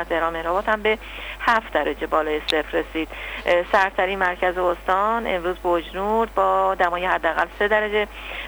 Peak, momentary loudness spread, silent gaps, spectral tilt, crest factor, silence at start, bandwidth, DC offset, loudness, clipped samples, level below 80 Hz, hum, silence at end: -6 dBFS; 6 LU; none; -4.5 dB/octave; 16 dB; 0 s; over 20 kHz; under 0.1%; -22 LUFS; under 0.1%; -42 dBFS; 50 Hz at -40 dBFS; 0 s